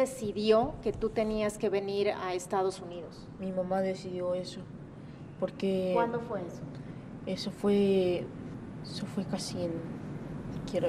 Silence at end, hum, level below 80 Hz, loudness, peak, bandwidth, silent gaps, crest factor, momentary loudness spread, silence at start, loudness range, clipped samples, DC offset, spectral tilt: 0 s; none; -56 dBFS; -32 LUFS; -12 dBFS; 14 kHz; none; 20 dB; 16 LU; 0 s; 4 LU; under 0.1%; under 0.1%; -6 dB/octave